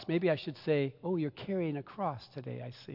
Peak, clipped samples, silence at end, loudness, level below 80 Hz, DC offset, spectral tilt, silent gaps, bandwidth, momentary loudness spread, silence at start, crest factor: -18 dBFS; under 0.1%; 0 s; -35 LUFS; -74 dBFS; under 0.1%; -9 dB/octave; none; 5.8 kHz; 12 LU; 0 s; 16 dB